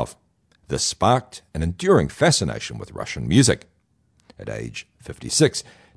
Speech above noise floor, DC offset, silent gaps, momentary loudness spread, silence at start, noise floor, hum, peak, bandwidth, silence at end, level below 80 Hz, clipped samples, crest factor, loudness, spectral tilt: 42 dB; under 0.1%; none; 17 LU; 0 s; -64 dBFS; none; -4 dBFS; 11 kHz; 0.35 s; -42 dBFS; under 0.1%; 20 dB; -21 LUFS; -4.5 dB/octave